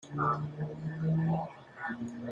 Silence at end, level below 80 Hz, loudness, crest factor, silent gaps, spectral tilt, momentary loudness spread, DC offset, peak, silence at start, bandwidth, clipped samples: 0 s; -64 dBFS; -34 LUFS; 16 dB; none; -8.5 dB/octave; 9 LU; under 0.1%; -18 dBFS; 0 s; 7.2 kHz; under 0.1%